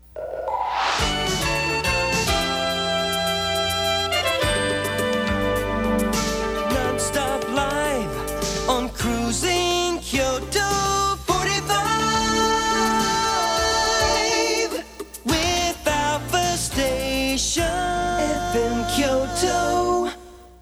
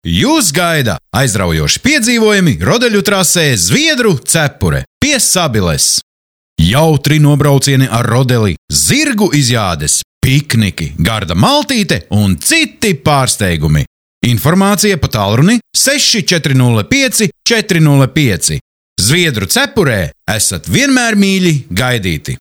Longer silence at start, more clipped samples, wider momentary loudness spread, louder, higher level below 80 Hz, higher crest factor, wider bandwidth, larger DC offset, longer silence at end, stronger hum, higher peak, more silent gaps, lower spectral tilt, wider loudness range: about the same, 0.15 s vs 0.05 s; neither; about the same, 4 LU vs 5 LU; second, -21 LUFS vs -10 LUFS; about the same, -36 dBFS vs -32 dBFS; first, 16 dB vs 10 dB; first, over 20 kHz vs 18 kHz; neither; about the same, 0.05 s vs 0.05 s; neither; second, -6 dBFS vs 0 dBFS; second, none vs 4.87-5.01 s, 6.03-6.56 s, 8.58-8.68 s, 10.04-10.21 s, 13.87-14.21 s, 18.61-18.96 s; about the same, -3 dB/octave vs -4 dB/octave; about the same, 3 LU vs 2 LU